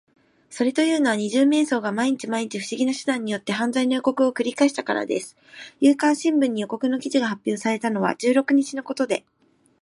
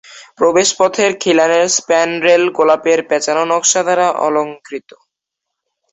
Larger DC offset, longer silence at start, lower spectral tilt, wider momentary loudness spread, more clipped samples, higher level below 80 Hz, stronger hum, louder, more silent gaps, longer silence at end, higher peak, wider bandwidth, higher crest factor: neither; first, 0.5 s vs 0.1 s; first, -4.5 dB/octave vs -2 dB/octave; about the same, 8 LU vs 6 LU; neither; second, -74 dBFS vs -60 dBFS; neither; second, -22 LUFS vs -13 LUFS; neither; second, 0.65 s vs 1.15 s; second, -6 dBFS vs 0 dBFS; first, 11.5 kHz vs 8.2 kHz; about the same, 16 dB vs 14 dB